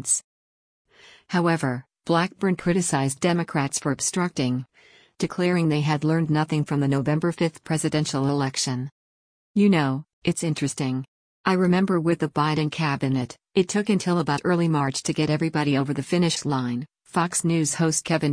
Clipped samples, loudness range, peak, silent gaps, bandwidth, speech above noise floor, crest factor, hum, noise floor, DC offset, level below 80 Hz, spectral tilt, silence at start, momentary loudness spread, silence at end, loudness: under 0.1%; 2 LU; -8 dBFS; 0.24-0.85 s, 8.92-9.54 s, 10.13-10.22 s, 11.08-11.44 s; 10.5 kHz; over 67 dB; 16 dB; none; under -90 dBFS; under 0.1%; -60 dBFS; -5 dB/octave; 0 s; 6 LU; 0 s; -24 LUFS